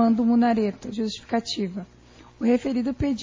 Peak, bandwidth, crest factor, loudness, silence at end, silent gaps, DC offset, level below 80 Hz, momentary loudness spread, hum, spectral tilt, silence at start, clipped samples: -10 dBFS; 7.6 kHz; 14 dB; -24 LUFS; 0 s; none; under 0.1%; -48 dBFS; 10 LU; none; -6 dB/octave; 0 s; under 0.1%